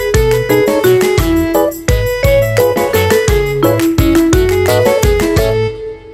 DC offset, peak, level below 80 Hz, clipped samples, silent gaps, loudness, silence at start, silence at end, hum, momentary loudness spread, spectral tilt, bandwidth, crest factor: under 0.1%; 0 dBFS; -22 dBFS; under 0.1%; none; -11 LUFS; 0 s; 0 s; none; 4 LU; -5.5 dB/octave; 16.5 kHz; 10 dB